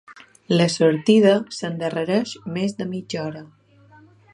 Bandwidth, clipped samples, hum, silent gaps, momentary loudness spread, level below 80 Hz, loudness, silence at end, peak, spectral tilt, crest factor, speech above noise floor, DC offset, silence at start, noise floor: 11.5 kHz; under 0.1%; none; none; 13 LU; -68 dBFS; -21 LUFS; 0.9 s; -4 dBFS; -6 dB/octave; 18 dB; 31 dB; under 0.1%; 0.1 s; -51 dBFS